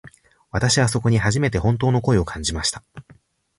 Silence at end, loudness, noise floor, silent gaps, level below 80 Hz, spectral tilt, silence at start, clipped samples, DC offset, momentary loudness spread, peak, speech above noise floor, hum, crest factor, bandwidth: 0.6 s; -20 LUFS; -48 dBFS; none; -38 dBFS; -5 dB/octave; 0.05 s; under 0.1%; under 0.1%; 7 LU; -6 dBFS; 28 dB; none; 16 dB; 11.5 kHz